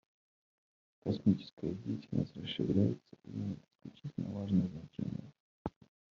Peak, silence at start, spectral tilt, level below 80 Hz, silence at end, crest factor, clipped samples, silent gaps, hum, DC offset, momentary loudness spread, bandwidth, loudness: -16 dBFS; 1.05 s; -8 dB/octave; -64 dBFS; 0.45 s; 22 dB; under 0.1%; 1.53-1.57 s, 3.75-3.79 s, 5.40-5.65 s; none; under 0.1%; 14 LU; 7 kHz; -37 LUFS